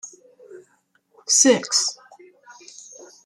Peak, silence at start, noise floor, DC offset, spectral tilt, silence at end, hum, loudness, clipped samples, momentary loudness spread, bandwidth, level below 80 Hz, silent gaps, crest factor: -2 dBFS; 0.05 s; -64 dBFS; under 0.1%; -1 dB/octave; 0.75 s; none; -17 LUFS; under 0.1%; 26 LU; 13 kHz; -74 dBFS; none; 22 dB